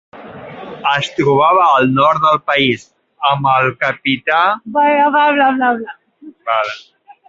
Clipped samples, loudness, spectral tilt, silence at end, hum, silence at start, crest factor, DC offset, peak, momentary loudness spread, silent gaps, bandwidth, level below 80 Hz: under 0.1%; -13 LUFS; -5.5 dB/octave; 0.15 s; none; 0.15 s; 14 dB; under 0.1%; -2 dBFS; 15 LU; none; 7.8 kHz; -56 dBFS